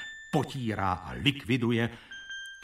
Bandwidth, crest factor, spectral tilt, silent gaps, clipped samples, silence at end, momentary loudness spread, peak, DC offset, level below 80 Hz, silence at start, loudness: 15 kHz; 20 dB; -6 dB/octave; none; under 0.1%; 0 s; 13 LU; -10 dBFS; under 0.1%; -54 dBFS; 0 s; -30 LUFS